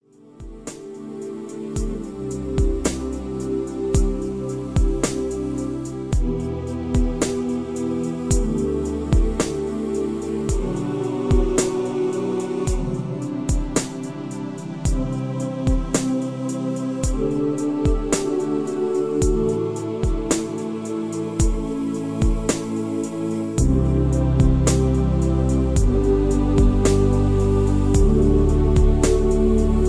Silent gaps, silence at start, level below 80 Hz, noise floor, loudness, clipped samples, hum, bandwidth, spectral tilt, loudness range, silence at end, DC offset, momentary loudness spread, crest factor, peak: none; 0.25 s; -24 dBFS; -41 dBFS; -22 LUFS; under 0.1%; none; 11 kHz; -6.5 dB/octave; 7 LU; 0 s; 0.2%; 10 LU; 18 dB; -4 dBFS